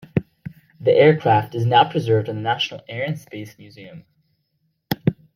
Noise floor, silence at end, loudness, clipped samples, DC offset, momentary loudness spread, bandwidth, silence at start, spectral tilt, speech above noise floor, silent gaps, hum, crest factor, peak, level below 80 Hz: -70 dBFS; 0.25 s; -19 LUFS; under 0.1%; under 0.1%; 25 LU; 15.5 kHz; 0.15 s; -7 dB/octave; 51 dB; none; none; 18 dB; -2 dBFS; -58 dBFS